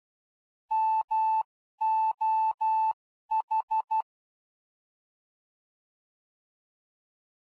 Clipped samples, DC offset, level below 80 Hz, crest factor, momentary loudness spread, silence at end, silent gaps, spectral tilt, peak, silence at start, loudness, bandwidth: under 0.1%; under 0.1%; -88 dBFS; 10 dB; 5 LU; 3.4 s; 1.04-1.08 s, 1.45-1.78 s, 2.54-2.58 s, 2.93-3.29 s, 3.43-3.48 s, 3.63-3.68 s; -0.5 dB/octave; -22 dBFS; 0.7 s; -28 LUFS; 4.7 kHz